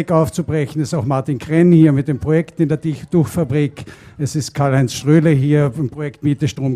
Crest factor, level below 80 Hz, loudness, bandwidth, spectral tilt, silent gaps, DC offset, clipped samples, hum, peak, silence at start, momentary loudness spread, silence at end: 14 dB; -46 dBFS; -16 LUFS; 14 kHz; -7.5 dB/octave; none; under 0.1%; under 0.1%; none; 0 dBFS; 0 s; 10 LU; 0 s